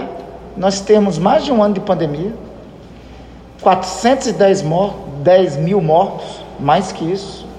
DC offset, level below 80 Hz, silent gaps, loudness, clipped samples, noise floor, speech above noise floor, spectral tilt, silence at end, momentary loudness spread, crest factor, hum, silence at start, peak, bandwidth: under 0.1%; -42 dBFS; none; -15 LUFS; under 0.1%; -36 dBFS; 22 dB; -6 dB/octave; 0 s; 15 LU; 14 dB; none; 0 s; 0 dBFS; 10.5 kHz